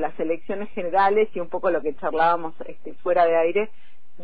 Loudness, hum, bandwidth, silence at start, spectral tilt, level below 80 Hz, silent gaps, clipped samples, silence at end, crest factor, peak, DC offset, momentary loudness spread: -23 LUFS; none; 5 kHz; 0 s; -8.5 dB/octave; -56 dBFS; none; under 0.1%; 0 s; 14 dB; -8 dBFS; 4%; 13 LU